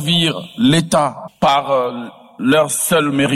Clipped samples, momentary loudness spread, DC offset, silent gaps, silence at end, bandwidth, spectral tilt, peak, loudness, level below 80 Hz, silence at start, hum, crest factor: under 0.1%; 8 LU; under 0.1%; none; 0 s; 16 kHz; -4 dB/octave; -4 dBFS; -16 LUFS; -52 dBFS; 0 s; none; 12 dB